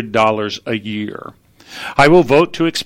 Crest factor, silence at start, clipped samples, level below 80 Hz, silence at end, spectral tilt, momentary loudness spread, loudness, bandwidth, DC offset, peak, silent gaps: 16 dB; 0 s; under 0.1%; -44 dBFS; 0 s; -5.5 dB/octave; 18 LU; -14 LUFS; 15.5 kHz; under 0.1%; 0 dBFS; none